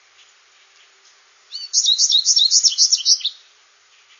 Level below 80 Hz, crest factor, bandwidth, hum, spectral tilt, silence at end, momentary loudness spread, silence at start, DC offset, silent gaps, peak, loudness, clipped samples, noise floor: under -90 dBFS; 18 dB; 7.4 kHz; none; 9 dB/octave; 0.85 s; 14 LU; 1.5 s; under 0.1%; none; -2 dBFS; -13 LUFS; under 0.1%; -54 dBFS